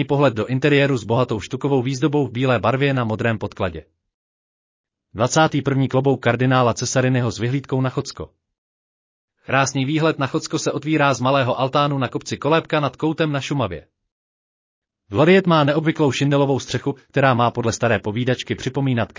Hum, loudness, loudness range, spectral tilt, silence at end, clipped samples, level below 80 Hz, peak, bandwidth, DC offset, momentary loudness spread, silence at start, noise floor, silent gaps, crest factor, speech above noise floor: none; -19 LUFS; 5 LU; -5.5 dB/octave; 0.1 s; under 0.1%; -50 dBFS; -4 dBFS; 7.6 kHz; under 0.1%; 8 LU; 0 s; under -90 dBFS; 4.14-4.84 s, 8.58-9.28 s, 14.12-14.82 s; 16 dB; over 71 dB